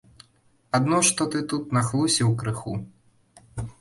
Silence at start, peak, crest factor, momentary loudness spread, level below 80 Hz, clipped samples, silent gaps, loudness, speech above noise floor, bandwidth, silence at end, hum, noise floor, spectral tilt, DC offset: 0.75 s; -6 dBFS; 20 dB; 16 LU; -52 dBFS; under 0.1%; none; -23 LUFS; 39 dB; 11.5 kHz; 0.1 s; none; -62 dBFS; -4 dB/octave; under 0.1%